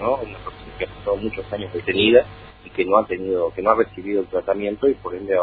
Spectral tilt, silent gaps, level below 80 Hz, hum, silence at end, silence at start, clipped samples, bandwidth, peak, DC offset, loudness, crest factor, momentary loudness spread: -8.5 dB/octave; none; -46 dBFS; none; 0 s; 0 s; under 0.1%; 4.7 kHz; 0 dBFS; under 0.1%; -21 LUFS; 20 dB; 16 LU